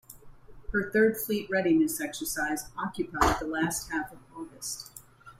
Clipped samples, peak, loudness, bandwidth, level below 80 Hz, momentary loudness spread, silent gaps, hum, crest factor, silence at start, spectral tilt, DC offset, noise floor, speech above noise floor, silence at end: under 0.1%; -10 dBFS; -29 LUFS; 16 kHz; -46 dBFS; 15 LU; none; none; 20 dB; 0.1 s; -4 dB/octave; under 0.1%; -49 dBFS; 20 dB; 0.05 s